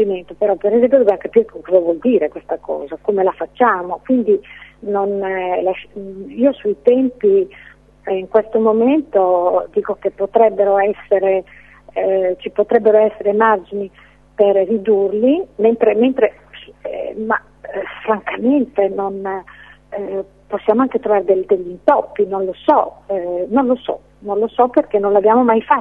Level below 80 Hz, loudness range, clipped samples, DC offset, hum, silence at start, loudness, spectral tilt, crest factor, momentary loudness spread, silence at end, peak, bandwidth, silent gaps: -52 dBFS; 4 LU; under 0.1%; under 0.1%; none; 0 s; -16 LUFS; -8.5 dB/octave; 16 dB; 13 LU; 0 s; 0 dBFS; 3.9 kHz; none